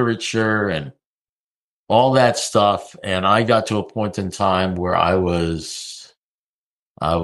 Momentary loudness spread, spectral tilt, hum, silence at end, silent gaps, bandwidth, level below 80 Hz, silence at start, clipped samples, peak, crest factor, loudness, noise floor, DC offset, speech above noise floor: 12 LU; -5 dB/octave; none; 0 s; 1.06-1.87 s, 6.17-6.95 s; 12.5 kHz; -46 dBFS; 0 s; under 0.1%; -2 dBFS; 18 dB; -19 LUFS; under -90 dBFS; under 0.1%; over 72 dB